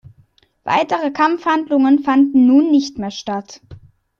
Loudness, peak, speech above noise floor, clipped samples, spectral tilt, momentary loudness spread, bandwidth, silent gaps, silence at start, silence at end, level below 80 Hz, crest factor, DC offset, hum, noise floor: -15 LUFS; -2 dBFS; 40 dB; under 0.1%; -5 dB/octave; 14 LU; 7.2 kHz; none; 0.65 s; 0.45 s; -56 dBFS; 14 dB; under 0.1%; none; -55 dBFS